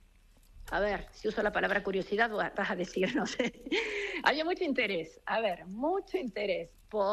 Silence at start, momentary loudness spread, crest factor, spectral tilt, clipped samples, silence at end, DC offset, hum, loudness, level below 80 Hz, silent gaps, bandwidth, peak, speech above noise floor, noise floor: 0.55 s; 6 LU; 20 dB; -4.5 dB/octave; under 0.1%; 0 s; under 0.1%; none; -32 LUFS; -56 dBFS; none; 13 kHz; -12 dBFS; 28 dB; -61 dBFS